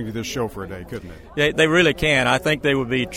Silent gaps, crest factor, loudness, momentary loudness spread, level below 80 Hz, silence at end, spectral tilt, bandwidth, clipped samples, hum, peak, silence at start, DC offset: none; 18 dB; -19 LUFS; 17 LU; -42 dBFS; 0 s; -4.5 dB/octave; 16.5 kHz; under 0.1%; none; -4 dBFS; 0 s; under 0.1%